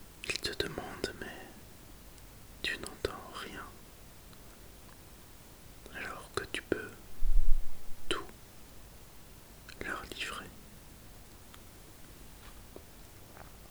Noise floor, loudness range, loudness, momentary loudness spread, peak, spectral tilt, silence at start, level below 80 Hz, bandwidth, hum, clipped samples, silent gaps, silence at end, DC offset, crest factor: -54 dBFS; 7 LU; -40 LUFS; 17 LU; -10 dBFS; -3.5 dB/octave; 0.25 s; -38 dBFS; over 20 kHz; none; under 0.1%; none; 1.65 s; under 0.1%; 24 dB